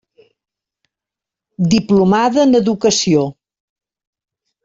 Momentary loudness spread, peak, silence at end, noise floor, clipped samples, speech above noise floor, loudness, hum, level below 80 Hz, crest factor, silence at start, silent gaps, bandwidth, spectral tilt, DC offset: 5 LU; -2 dBFS; 1.35 s; -86 dBFS; under 0.1%; 73 dB; -14 LUFS; none; -52 dBFS; 14 dB; 1.6 s; none; 7.8 kHz; -5 dB/octave; under 0.1%